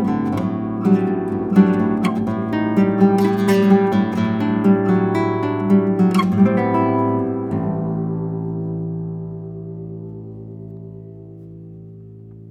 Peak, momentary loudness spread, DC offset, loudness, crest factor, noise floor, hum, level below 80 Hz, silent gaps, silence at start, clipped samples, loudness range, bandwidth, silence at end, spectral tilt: 0 dBFS; 20 LU; under 0.1%; -18 LUFS; 18 dB; -38 dBFS; none; -54 dBFS; none; 0 s; under 0.1%; 14 LU; 13 kHz; 0 s; -8.5 dB/octave